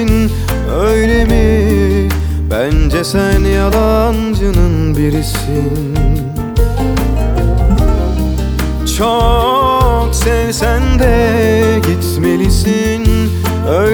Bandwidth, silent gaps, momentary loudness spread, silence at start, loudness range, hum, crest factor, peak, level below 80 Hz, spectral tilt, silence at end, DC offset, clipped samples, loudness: over 20 kHz; none; 5 LU; 0 s; 3 LU; none; 10 dB; 0 dBFS; -16 dBFS; -6 dB/octave; 0 s; under 0.1%; under 0.1%; -13 LUFS